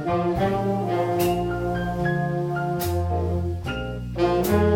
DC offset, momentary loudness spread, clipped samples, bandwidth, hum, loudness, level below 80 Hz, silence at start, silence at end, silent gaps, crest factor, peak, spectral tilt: under 0.1%; 6 LU; under 0.1%; 19 kHz; none; -24 LUFS; -38 dBFS; 0 s; 0 s; none; 14 dB; -8 dBFS; -7 dB/octave